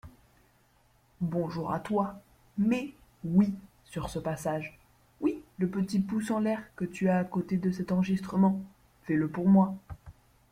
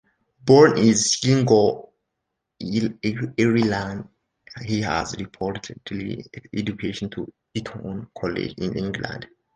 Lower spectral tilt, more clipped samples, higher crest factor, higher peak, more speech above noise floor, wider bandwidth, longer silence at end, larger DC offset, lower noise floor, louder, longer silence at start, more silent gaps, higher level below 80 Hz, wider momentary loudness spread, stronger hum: first, -8 dB/octave vs -5 dB/octave; neither; about the same, 18 dB vs 20 dB; second, -12 dBFS vs -2 dBFS; second, 37 dB vs 58 dB; first, 12.5 kHz vs 10 kHz; about the same, 0.4 s vs 0.3 s; neither; second, -65 dBFS vs -80 dBFS; second, -30 LUFS vs -22 LUFS; second, 0.05 s vs 0.45 s; neither; second, -58 dBFS vs -52 dBFS; about the same, 16 LU vs 17 LU; neither